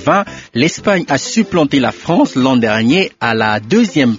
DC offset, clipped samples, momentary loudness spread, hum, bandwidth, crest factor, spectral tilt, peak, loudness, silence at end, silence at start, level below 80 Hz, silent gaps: under 0.1%; under 0.1%; 3 LU; none; 7.8 kHz; 14 dB; -4 dB/octave; 0 dBFS; -13 LUFS; 0 s; 0 s; -48 dBFS; none